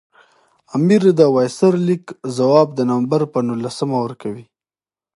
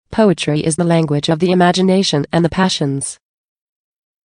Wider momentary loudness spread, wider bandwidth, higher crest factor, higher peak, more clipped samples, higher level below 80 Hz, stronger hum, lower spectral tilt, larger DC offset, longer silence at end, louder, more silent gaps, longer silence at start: first, 13 LU vs 5 LU; about the same, 11.5 kHz vs 10.5 kHz; about the same, 16 dB vs 14 dB; about the same, 0 dBFS vs 0 dBFS; neither; second, -66 dBFS vs -48 dBFS; neither; first, -7 dB/octave vs -5.5 dB/octave; neither; second, 0.75 s vs 1.1 s; about the same, -17 LUFS vs -15 LUFS; neither; first, 0.75 s vs 0.1 s